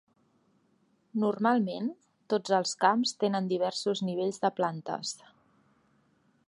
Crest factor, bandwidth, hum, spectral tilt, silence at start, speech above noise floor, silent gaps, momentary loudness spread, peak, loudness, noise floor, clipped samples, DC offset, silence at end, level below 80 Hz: 22 dB; 11.5 kHz; none; -4.5 dB/octave; 1.15 s; 41 dB; none; 10 LU; -10 dBFS; -30 LUFS; -70 dBFS; under 0.1%; under 0.1%; 1.3 s; -84 dBFS